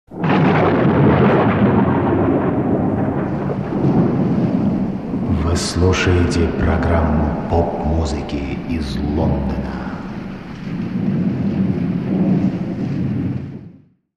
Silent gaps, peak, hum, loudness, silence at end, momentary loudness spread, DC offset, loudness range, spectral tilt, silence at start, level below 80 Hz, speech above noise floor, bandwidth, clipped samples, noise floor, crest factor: none; -2 dBFS; none; -18 LUFS; 0.4 s; 10 LU; 0.3%; 6 LU; -7.5 dB/octave; 0.1 s; -30 dBFS; 26 dB; 11 kHz; under 0.1%; -44 dBFS; 16 dB